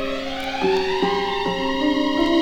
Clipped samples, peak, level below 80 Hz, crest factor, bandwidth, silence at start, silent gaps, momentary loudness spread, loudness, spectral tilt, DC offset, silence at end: under 0.1%; -8 dBFS; -42 dBFS; 12 dB; 17.5 kHz; 0 s; none; 6 LU; -21 LUFS; -5 dB/octave; under 0.1%; 0 s